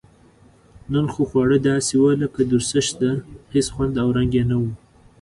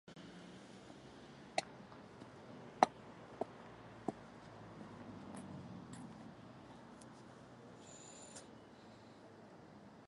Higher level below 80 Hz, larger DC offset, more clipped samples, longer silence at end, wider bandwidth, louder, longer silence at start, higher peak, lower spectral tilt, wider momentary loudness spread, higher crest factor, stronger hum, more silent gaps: first, -42 dBFS vs -76 dBFS; neither; neither; first, 0.45 s vs 0 s; about the same, 11.5 kHz vs 11 kHz; first, -20 LUFS vs -48 LUFS; first, 0.9 s vs 0.05 s; first, -6 dBFS vs -10 dBFS; about the same, -5.5 dB/octave vs -4.5 dB/octave; second, 7 LU vs 15 LU; second, 16 dB vs 38 dB; neither; neither